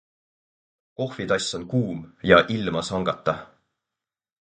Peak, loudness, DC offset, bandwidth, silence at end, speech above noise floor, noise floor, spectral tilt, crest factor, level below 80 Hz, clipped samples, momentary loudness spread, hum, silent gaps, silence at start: 0 dBFS; -24 LUFS; under 0.1%; 9.6 kHz; 0.95 s; 66 dB; -89 dBFS; -5 dB/octave; 24 dB; -52 dBFS; under 0.1%; 14 LU; none; none; 1 s